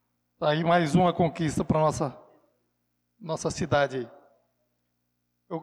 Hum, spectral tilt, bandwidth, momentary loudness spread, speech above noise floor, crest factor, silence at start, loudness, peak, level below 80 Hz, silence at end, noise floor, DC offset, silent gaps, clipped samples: 60 Hz at -60 dBFS; -6 dB/octave; 12.5 kHz; 14 LU; 52 dB; 16 dB; 0.4 s; -26 LUFS; -12 dBFS; -54 dBFS; 0 s; -77 dBFS; under 0.1%; none; under 0.1%